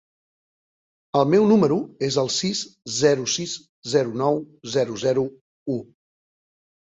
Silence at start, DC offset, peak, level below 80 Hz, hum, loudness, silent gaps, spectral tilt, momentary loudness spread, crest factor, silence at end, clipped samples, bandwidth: 1.15 s; under 0.1%; -6 dBFS; -64 dBFS; none; -22 LUFS; 3.69-3.82 s, 5.41-5.66 s; -4.5 dB/octave; 12 LU; 18 dB; 1.1 s; under 0.1%; 8.2 kHz